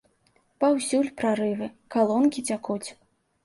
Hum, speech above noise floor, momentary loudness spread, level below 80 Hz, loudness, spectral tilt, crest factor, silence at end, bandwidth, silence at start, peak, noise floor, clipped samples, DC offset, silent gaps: none; 41 dB; 11 LU; -68 dBFS; -25 LUFS; -4.5 dB/octave; 16 dB; 0.5 s; 11.5 kHz; 0.6 s; -10 dBFS; -66 dBFS; under 0.1%; under 0.1%; none